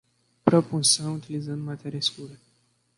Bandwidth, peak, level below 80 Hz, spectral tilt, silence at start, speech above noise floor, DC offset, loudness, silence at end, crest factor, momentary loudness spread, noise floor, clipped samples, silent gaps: 11.5 kHz; -2 dBFS; -62 dBFS; -4 dB/octave; 0.45 s; 41 dB; under 0.1%; -25 LUFS; 0.65 s; 24 dB; 13 LU; -67 dBFS; under 0.1%; none